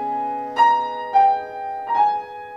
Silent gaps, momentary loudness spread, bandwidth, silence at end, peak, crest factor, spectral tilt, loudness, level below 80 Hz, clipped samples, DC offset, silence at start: none; 11 LU; 7.4 kHz; 0 s; -6 dBFS; 14 dB; -3.5 dB/octave; -20 LUFS; -66 dBFS; under 0.1%; under 0.1%; 0 s